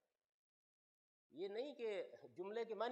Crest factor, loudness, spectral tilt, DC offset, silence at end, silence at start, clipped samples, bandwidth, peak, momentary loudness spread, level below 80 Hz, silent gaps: 20 dB; -48 LUFS; -5 dB/octave; under 0.1%; 0 s; 1.35 s; under 0.1%; 8.4 kHz; -30 dBFS; 9 LU; under -90 dBFS; none